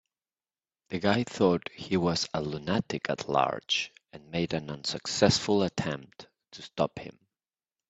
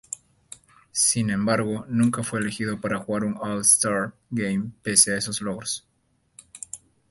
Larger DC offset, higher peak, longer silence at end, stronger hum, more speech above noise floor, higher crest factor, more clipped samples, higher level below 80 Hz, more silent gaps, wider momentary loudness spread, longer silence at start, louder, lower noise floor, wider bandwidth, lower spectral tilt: neither; second, -6 dBFS vs -2 dBFS; first, 0.8 s vs 0.35 s; neither; first, over 61 dB vs 33 dB; about the same, 24 dB vs 24 dB; neither; about the same, -62 dBFS vs -58 dBFS; neither; second, 13 LU vs 20 LU; first, 0.9 s vs 0.1 s; second, -29 LUFS vs -23 LUFS; first, under -90 dBFS vs -57 dBFS; second, 8.4 kHz vs 12 kHz; first, -4.5 dB/octave vs -3 dB/octave